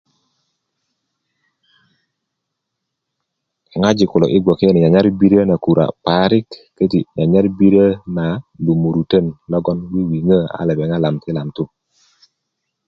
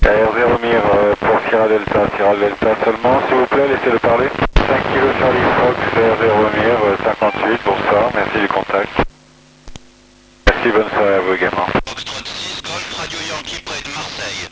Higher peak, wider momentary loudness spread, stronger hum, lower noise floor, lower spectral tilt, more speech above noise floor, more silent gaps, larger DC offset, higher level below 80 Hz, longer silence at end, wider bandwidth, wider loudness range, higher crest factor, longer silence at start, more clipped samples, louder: about the same, 0 dBFS vs 0 dBFS; about the same, 10 LU vs 10 LU; neither; first, -77 dBFS vs -47 dBFS; first, -8 dB/octave vs -5 dB/octave; first, 63 dB vs 33 dB; neither; neither; second, -46 dBFS vs -28 dBFS; first, 1.2 s vs 0.05 s; second, 6.8 kHz vs 8 kHz; about the same, 6 LU vs 4 LU; about the same, 16 dB vs 16 dB; first, 3.75 s vs 0 s; neither; about the same, -15 LUFS vs -15 LUFS